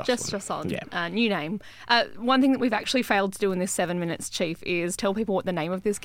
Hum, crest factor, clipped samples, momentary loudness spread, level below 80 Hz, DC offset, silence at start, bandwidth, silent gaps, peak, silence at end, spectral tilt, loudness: none; 20 dB; under 0.1%; 8 LU; -58 dBFS; under 0.1%; 0 s; 16.5 kHz; none; -6 dBFS; 0 s; -4 dB/octave; -26 LUFS